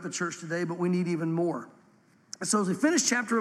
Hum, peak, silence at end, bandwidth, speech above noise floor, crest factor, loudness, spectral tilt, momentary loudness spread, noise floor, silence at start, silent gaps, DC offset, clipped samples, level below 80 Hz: none; -10 dBFS; 0 s; 13.5 kHz; 34 dB; 18 dB; -28 LUFS; -4 dB/octave; 10 LU; -61 dBFS; 0 s; none; under 0.1%; under 0.1%; -82 dBFS